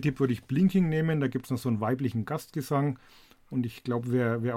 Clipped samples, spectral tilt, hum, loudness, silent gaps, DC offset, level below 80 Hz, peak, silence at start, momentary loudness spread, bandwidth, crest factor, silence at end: under 0.1%; -8 dB/octave; none; -29 LUFS; none; under 0.1%; -60 dBFS; -14 dBFS; 0 s; 8 LU; 16 kHz; 16 dB; 0 s